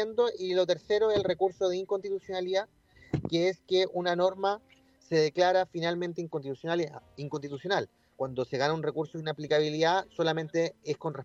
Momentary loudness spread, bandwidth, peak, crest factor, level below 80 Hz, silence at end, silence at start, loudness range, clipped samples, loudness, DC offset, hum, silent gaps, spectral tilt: 10 LU; 7.8 kHz; -12 dBFS; 18 dB; -64 dBFS; 0 s; 0 s; 4 LU; under 0.1%; -30 LUFS; under 0.1%; none; none; -5.5 dB/octave